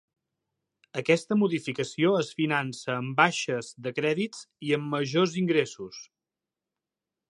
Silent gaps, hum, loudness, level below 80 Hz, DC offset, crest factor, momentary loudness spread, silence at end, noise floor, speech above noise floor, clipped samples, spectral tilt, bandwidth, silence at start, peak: none; none; -27 LUFS; -74 dBFS; under 0.1%; 24 dB; 11 LU; 1.3 s; -89 dBFS; 62 dB; under 0.1%; -5 dB/octave; 11.5 kHz; 0.95 s; -4 dBFS